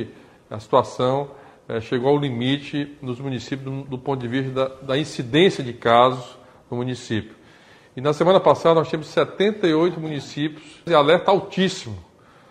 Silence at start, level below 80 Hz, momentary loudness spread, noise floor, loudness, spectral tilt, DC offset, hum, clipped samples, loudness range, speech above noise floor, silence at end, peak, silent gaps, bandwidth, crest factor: 0 s; -58 dBFS; 15 LU; -50 dBFS; -21 LUFS; -6 dB/octave; under 0.1%; none; under 0.1%; 5 LU; 29 dB; 0.5 s; 0 dBFS; none; 10.5 kHz; 20 dB